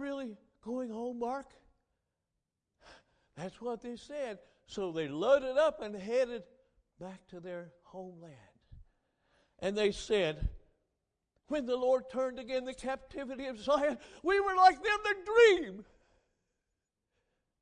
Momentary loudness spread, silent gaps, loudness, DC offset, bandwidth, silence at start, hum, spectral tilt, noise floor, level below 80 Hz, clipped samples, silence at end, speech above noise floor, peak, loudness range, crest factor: 23 LU; none; -32 LUFS; under 0.1%; 10 kHz; 0 s; none; -4.5 dB/octave; -87 dBFS; -54 dBFS; under 0.1%; 1.8 s; 55 dB; -12 dBFS; 15 LU; 24 dB